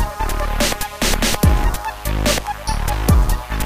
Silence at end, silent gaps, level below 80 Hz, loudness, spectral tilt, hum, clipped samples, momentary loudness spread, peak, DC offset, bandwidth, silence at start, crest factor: 0 s; none; -20 dBFS; -19 LUFS; -4 dB/octave; none; under 0.1%; 7 LU; -2 dBFS; under 0.1%; 16 kHz; 0 s; 16 dB